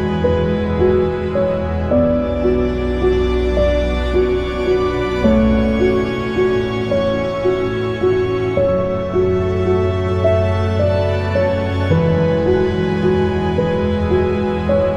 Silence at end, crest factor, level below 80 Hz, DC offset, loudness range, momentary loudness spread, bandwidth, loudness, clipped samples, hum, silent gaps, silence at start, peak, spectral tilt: 0 s; 14 dB; -28 dBFS; under 0.1%; 1 LU; 3 LU; 8.2 kHz; -17 LUFS; under 0.1%; none; none; 0 s; -2 dBFS; -8 dB/octave